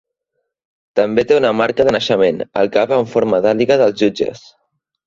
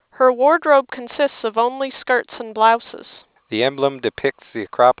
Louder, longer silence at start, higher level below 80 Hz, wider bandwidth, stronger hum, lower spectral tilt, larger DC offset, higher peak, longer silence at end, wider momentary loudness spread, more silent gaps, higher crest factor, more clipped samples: first, -15 LUFS vs -18 LUFS; first, 0.95 s vs 0.2 s; first, -52 dBFS vs -64 dBFS; first, 7.6 kHz vs 4 kHz; neither; second, -5.5 dB/octave vs -8 dB/octave; neither; about the same, 0 dBFS vs 0 dBFS; first, 0.7 s vs 0.1 s; second, 5 LU vs 14 LU; neither; about the same, 14 dB vs 18 dB; neither